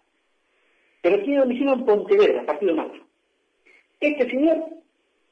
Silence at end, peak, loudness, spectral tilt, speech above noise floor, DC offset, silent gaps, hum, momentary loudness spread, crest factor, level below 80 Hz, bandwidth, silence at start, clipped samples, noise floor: 0.55 s; -8 dBFS; -21 LUFS; -6.5 dB/octave; 50 dB; under 0.1%; none; none; 8 LU; 14 dB; -68 dBFS; 6.4 kHz; 1.05 s; under 0.1%; -70 dBFS